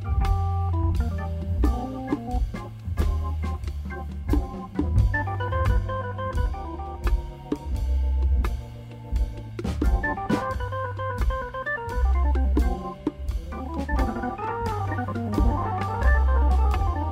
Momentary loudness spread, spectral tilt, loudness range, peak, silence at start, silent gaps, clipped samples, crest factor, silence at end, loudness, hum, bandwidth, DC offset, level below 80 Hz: 9 LU; -8 dB/octave; 3 LU; -10 dBFS; 0 s; none; under 0.1%; 16 dB; 0 s; -27 LUFS; none; 9 kHz; under 0.1%; -26 dBFS